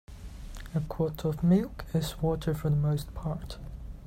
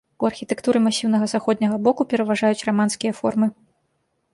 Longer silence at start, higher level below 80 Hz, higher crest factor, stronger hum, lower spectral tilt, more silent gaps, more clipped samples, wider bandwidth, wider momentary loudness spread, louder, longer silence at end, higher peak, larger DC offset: about the same, 0.1 s vs 0.2 s; first, -42 dBFS vs -64 dBFS; about the same, 16 dB vs 16 dB; neither; first, -7.5 dB/octave vs -5 dB/octave; neither; neither; first, 16 kHz vs 11.5 kHz; first, 19 LU vs 5 LU; second, -30 LUFS vs -21 LUFS; second, 0 s vs 0.8 s; second, -14 dBFS vs -4 dBFS; neither